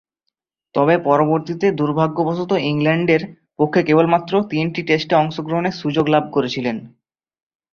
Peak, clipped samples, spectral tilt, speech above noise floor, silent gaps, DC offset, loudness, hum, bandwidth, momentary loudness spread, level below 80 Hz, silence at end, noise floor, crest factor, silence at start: -2 dBFS; under 0.1%; -7.5 dB/octave; 60 dB; none; under 0.1%; -18 LUFS; none; 7 kHz; 7 LU; -58 dBFS; 0.85 s; -77 dBFS; 16 dB; 0.75 s